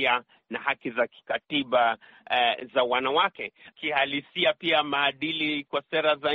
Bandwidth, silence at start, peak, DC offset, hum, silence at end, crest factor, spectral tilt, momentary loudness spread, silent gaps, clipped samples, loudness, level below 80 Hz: 5.4 kHz; 0 s; -10 dBFS; under 0.1%; none; 0 s; 18 dB; 0 dB/octave; 8 LU; none; under 0.1%; -26 LUFS; -70 dBFS